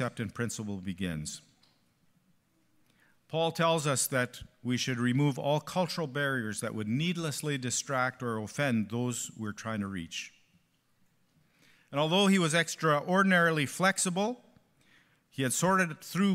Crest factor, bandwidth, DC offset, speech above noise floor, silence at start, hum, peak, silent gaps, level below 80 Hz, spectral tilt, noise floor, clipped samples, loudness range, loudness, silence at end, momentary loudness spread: 20 dB; 16 kHz; under 0.1%; 40 dB; 0 s; none; -12 dBFS; none; -68 dBFS; -4.5 dB/octave; -70 dBFS; under 0.1%; 9 LU; -30 LUFS; 0 s; 12 LU